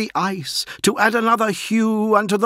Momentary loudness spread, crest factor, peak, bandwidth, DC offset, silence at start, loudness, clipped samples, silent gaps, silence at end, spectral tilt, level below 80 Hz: 6 LU; 16 dB; -2 dBFS; 16 kHz; under 0.1%; 0 s; -19 LUFS; under 0.1%; none; 0 s; -4 dB/octave; -62 dBFS